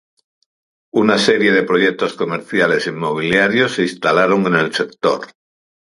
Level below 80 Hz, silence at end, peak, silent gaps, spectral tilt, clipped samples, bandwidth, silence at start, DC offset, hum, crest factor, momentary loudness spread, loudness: -58 dBFS; 0.65 s; 0 dBFS; none; -5 dB/octave; under 0.1%; 11.5 kHz; 0.95 s; under 0.1%; none; 16 dB; 7 LU; -16 LUFS